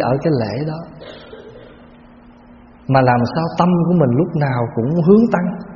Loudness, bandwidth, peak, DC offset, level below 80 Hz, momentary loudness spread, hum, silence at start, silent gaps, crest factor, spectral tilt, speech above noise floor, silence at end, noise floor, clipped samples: -16 LUFS; 6.8 kHz; 0 dBFS; under 0.1%; -48 dBFS; 23 LU; none; 0 s; none; 16 dB; -7.5 dB/octave; 28 dB; 0 s; -43 dBFS; under 0.1%